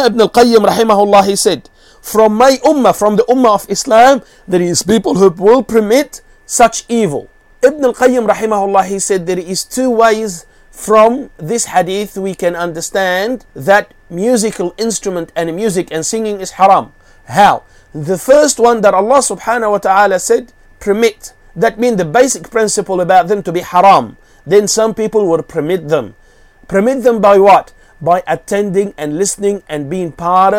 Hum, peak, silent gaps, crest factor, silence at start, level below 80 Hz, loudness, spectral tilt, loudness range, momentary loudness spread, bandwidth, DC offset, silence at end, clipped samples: none; 0 dBFS; none; 12 dB; 0 s; -44 dBFS; -12 LUFS; -4 dB/octave; 4 LU; 11 LU; 16.5 kHz; under 0.1%; 0 s; 0.4%